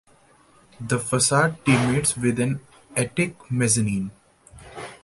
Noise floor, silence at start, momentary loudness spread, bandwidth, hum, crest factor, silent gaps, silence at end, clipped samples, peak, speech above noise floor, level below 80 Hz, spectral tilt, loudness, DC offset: -56 dBFS; 0.8 s; 17 LU; 12 kHz; none; 20 dB; none; 0.1 s; under 0.1%; -4 dBFS; 34 dB; -52 dBFS; -4.5 dB/octave; -22 LUFS; under 0.1%